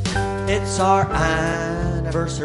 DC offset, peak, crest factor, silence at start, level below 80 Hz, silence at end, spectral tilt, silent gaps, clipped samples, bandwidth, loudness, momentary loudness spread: under 0.1%; -4 dBFS; 16 dB; 0 s; -32 dBFS; 0 s; -5 dB/octave; none; under 0.1%; 11.5 kHz; -21 LUFS; 6 LU